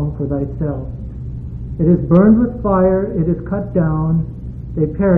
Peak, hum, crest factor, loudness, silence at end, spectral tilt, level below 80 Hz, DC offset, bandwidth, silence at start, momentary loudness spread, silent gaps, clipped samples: 0 dBFS; none; 16 dB; -16 LUFS; 0 s; -13.5 dB/octave; -30 dBFS; under 0.1%; 2.7 kHz; 0 s; 17 LU; none; under 0.1%